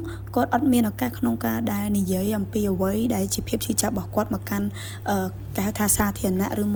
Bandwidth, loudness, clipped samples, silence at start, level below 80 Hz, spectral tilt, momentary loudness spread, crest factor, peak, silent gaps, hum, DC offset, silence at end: over 20 kHz; -24 LUFS; under 0.1%; 0 s; -42 dBFS; -5 dB/octave; 7 LU; 18 dB; -6 dBFS; none; none; under 0.1%; 0 s